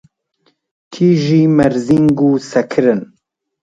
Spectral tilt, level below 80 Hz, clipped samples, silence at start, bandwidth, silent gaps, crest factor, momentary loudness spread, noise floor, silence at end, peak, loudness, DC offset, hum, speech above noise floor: -7.5 dB/octave; -48 dBFS; under 0.1%; 0.9 s; 9 kHz; none; 14 dB; 5 LU; -61 dBFS; 0.6 s; 0 dBFS; -13 LUFS; under 0.1%; none; 49 dB